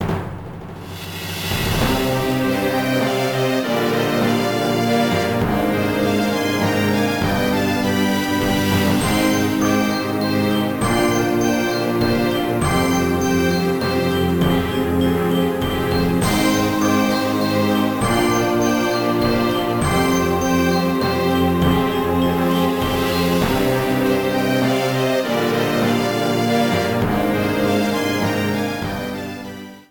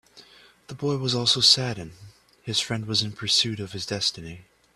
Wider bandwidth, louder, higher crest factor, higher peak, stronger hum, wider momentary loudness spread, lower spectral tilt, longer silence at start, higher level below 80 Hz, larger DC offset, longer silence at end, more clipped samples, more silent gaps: first, 19.5 kHz vs 14 kHz; first, -18 LUFS vs -23 LUFS; second, 14 dB vs 24 dB; about the same, -4 dBFS vs -4 dBFS; neither; second, 3 LU vs 23 LU; first, -5.5 dB/octave vs -3 dB/octave; second, 0 s vs 0.15 s; first, -38 dBFS vs -60 dBFS; first, 0.2% vs under 0.1%; second, 0.1 s vs 0.35 s; neither; neither